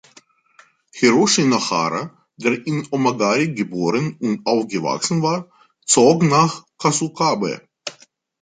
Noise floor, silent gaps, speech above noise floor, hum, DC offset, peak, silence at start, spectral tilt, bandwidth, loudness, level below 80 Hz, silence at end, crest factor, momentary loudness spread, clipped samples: -54 dBFS; none; 35 dB; none; under 0.1%; -2 dBFS; 0.95 s; -4 dB/octave; 9.6 kHz; -18 LUFS; -62 dBFS; 0.5 s; 18 dB; 13 LU; under 0.1%